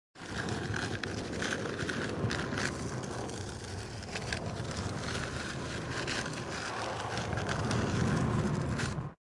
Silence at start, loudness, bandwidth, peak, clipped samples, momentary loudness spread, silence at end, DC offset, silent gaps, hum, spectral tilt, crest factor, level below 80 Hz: 0.15 s; -35 LUFS; 11.5 kHz; -16 dBFS; under 0.1%; 8 LU; 0.15 s; under 0.1%; none; none; -5 dB/octave; 18 dB; -50 dBFS